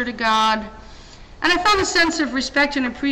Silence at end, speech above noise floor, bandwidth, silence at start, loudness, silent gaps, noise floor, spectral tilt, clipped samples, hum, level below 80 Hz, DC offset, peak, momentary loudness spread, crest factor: 0 s; 22 dB; 16.5 kHz; 0 s; -18 LUFS; none; -41 dBFS; -2.5 dB/octave; under 0.1%; none; -42 dBFS; under 0.1%; -4 dBFS; 7 LU; 16 dB